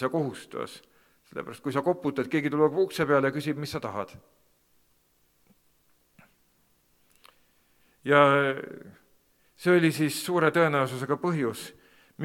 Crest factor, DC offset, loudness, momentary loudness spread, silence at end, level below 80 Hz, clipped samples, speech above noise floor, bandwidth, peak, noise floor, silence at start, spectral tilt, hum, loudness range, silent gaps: 24 dB; under 0.1%; -26 LUFS; 18 LU; 0 s; -70 dBFS; under 0.1%; 42 dB; 17.5 kHz; -4 dBFS; -68 dBFS; 0 s; -6 dB/octave; 60 Hz at -70 dBFS; 11 LU; none